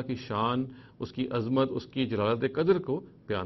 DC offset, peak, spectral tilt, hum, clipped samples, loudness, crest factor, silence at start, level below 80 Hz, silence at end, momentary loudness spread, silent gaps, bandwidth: under 0.1%; -12 dBFS; -8.5 dB/octave; none; under 0.1%; -30 LUFS; 18 dB; 0 s; -60 dBFS; 0 s; 9 LU; none; 6 kHz